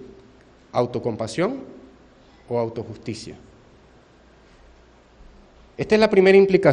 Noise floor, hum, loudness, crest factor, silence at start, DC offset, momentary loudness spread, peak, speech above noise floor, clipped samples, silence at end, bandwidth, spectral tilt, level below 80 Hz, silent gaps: -52 dBFS; none; -20 LUFS; 20 dB; 0 s; under 0.1%; 21 LU; -2 dBFS; 33 dB; under 0.1%; 0 s; 10 kHz; -6.5 dB/octave; -54 dBFS; none